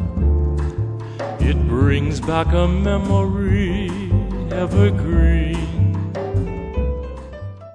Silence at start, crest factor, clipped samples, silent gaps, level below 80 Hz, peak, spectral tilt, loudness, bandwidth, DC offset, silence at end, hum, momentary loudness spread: 0 s; 16 dB; under 0.1%; none; -22 dBFS; -2 dBFS; -8 dB/octave; -20 LUFS; 10 kHz; under 0.1%; 0 s; none; 9 LU